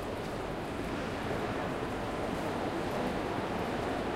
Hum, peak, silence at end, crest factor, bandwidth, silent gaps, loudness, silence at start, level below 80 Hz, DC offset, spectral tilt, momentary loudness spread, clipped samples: none; -20 dBFS; 0 s; 14 dB; 16 kHz; none; -35 LUFS; 0 s; -50 dBFS; under 0.1%; -6 dB/octave; 3 LU; under 0.1%